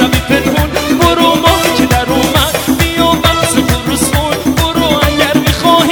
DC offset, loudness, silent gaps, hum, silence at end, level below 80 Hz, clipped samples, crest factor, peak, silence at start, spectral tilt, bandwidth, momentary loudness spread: under 0.1%; -10 LUFS; none; none; 0 s; -22 dBFS; 0.7%; 10 dB; 0 dBFS; 0 s; -4 dB/octave; over 20 kHz; 4 LU